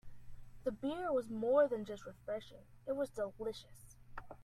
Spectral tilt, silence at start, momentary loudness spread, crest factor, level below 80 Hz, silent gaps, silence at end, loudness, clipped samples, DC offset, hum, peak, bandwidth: -6 dB/octave; 0.05 s; 22 LU; 20 dB; -62 dBFS; none; 0 s; -39 LUFS; under 0.1%; under 0.1%; none; -20 dBFS; 14 kHz